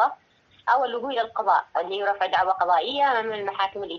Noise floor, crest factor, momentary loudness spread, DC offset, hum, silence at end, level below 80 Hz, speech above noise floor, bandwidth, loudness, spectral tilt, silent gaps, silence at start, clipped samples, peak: -59 dBFS; 16 dB; 6 LU; under 0.1%; none; 0 s; -68 dBFS; 35 dB; 6.8 kHz; -24 LUFS; -4 dB/octave; none; 0 s; under 0.1%; -8 dBFS